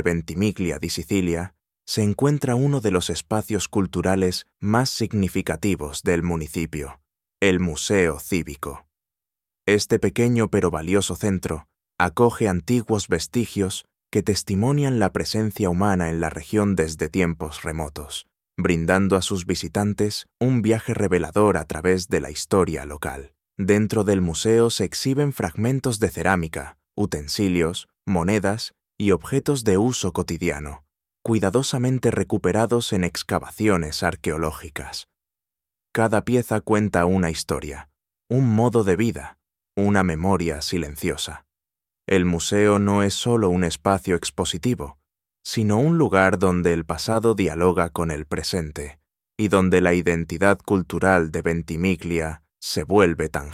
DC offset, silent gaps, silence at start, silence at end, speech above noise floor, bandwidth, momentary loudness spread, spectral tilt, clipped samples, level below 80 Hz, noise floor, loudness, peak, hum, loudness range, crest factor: under 0.1%; none; 0 s; 0 s; 67 dB; 16 kHz; 11 LU; -5.5 dB/octave; under 0.1%; -44 dBFS; -89 dBFS; -22 LUFS; -2 dBFS; none; 3 LU; 20 dB